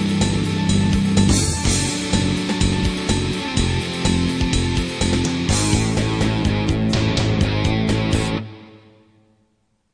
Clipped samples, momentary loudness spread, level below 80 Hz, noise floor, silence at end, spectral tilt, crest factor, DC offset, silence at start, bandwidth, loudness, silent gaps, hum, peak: under 0.1%; 3 LU; -30 dBFS; -65 dBFS; 1.15 s; -5 dB/octave; 16 dB; under 0.1%; 0 s; 10.5 kHz; -19 LUFS; none; none; -4 dBFS